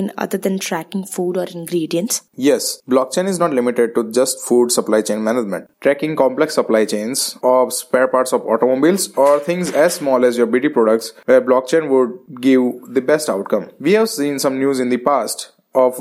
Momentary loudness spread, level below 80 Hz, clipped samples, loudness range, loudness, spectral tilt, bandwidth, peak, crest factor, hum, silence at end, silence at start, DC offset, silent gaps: 7 LU; -72 dBFS; under 0.1%; 3 LU; -17 LUFS; -4 dB/octave; 16 kHz; 0 dBFS; 16 dB; none; 0 s; 0 s; under 0.1%; none